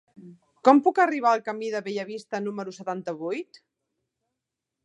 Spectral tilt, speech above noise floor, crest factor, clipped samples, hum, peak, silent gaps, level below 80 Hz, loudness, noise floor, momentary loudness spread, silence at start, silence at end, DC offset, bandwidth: -5.5 dB/octave; 61 dB; 24 dB; under 0.1%; none; -2 dBFS; none; -84 dBFS; -25 LUFS; -85 dBFS; 14 LU; 0.2 s; 1.4 s; under 0.1%; 10 kHz